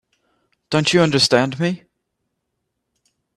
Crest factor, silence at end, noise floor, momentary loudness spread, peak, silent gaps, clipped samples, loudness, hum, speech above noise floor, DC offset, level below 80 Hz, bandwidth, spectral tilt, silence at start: 20 dB; 1.6 s; -76 dBFS; 9 LU; 0 dBFS; none; under 0.1%; -17 LUFS; none; 59 dB; under 0.1%; -58 dBFS; 13 kHz; -4.5 dB/octave; 0.7 s